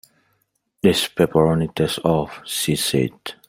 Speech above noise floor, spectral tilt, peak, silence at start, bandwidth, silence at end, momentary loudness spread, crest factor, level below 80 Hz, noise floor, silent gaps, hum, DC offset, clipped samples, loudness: 49 dB; -5 dB/octave; -2 dBFS; 0.85 s; 16.5 kHz; 0.15 s; 6 LU; 18 dB; -50 dBFS; -69 dBFS; none; none; under 0.1%; under 0.1%; -20 LUFS